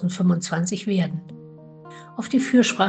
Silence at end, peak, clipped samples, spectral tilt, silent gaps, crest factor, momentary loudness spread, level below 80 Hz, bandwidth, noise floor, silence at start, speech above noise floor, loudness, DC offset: 0 s; -4 dBFS; under 0.1%; -5.5 dB/octave; none; 18 dB; 24 LU; -64 dBFS; 9 kHz; -43 dBFS; 0 s; 22 dB; -22 LUFS; under 0.1%